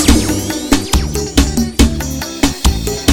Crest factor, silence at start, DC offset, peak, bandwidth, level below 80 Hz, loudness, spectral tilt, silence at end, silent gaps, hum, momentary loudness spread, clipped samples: 14 dB; 0 s; under 0.1%; 0 dBFS; 19 kHz; -18 dBFS; -15 LUFS; -4 dB/octave; 0 s; none; none; 4 LU; 0.3%